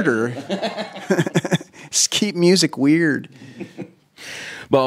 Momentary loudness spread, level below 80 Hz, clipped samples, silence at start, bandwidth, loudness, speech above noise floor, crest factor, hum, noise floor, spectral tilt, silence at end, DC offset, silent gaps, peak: 21 LU; -68 dBFS; under 0.1%; 0 s; 16 kHz; -19 LUFS; 20 dB; 20 dB; none; -39 dBFS; -4 dB/octave; 0 s; under 0.1%; none; -2 dBFS